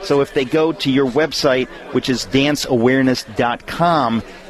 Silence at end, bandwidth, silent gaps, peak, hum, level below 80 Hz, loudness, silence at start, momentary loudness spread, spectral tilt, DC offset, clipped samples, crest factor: 0 s; 13.5 kHz; none; -2 dBFS; none; -44 dBFS; -17 LUFS; 0 s; 5 LU; -5 dB/octave; under 0.1%; under 0.1%; 14 dB